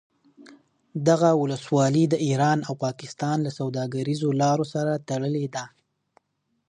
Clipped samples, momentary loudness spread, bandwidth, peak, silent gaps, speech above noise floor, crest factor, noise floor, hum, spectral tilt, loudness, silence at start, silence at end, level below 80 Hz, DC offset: under 0.1%; 10 LU; 10.5 kHz; -6 dBFS; none; 51 dB; 18 dB; -75 dBFS; none; -6.5 dB/octave; -24 LUFS; 0.4 s; 1 s; -70 dBFS; under 0.1%